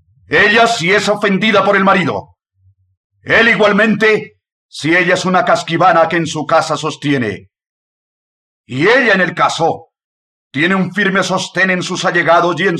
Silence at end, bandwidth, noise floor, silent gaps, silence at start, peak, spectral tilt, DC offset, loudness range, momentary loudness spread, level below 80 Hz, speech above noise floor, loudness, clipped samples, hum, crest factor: 0 s; 12 kHz; -55 dBFS; 2.97-3.10 s, 4.52-4.69 s, 7.69-8.64 s, 10.04-10.51 s; 0.3 s; -2 dBFS; -4.5 dB/octave; under 0.1%; 4 LU; 8 LU; -54 dBFS; 42 dB; -12 LUFS; under 0.1%; none; 12 dB